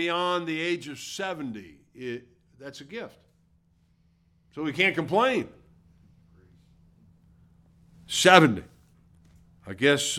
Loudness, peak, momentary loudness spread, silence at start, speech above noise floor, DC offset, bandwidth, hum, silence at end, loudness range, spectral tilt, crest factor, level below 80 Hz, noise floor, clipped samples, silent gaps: -24 LUFS; -2 dBFS; 25 LU; 0 s; 39 dB; under 0.1%; 16.5 kHz; none; 0 s; 14 LU; -3.5 dB/octave; 28 dB; -64 dBFS; -65 dBFS; under 0.1%; none